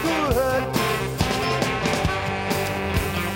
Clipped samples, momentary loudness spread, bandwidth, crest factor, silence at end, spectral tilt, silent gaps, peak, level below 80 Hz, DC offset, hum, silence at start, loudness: under 0.1%; 3 LU; 16.5 kHz; 18 dB; 0 s; -4.5 dB/octave; none; -6 dBFS; -36 dBFS; under 0.1%; none; 0 s; -23 LUFS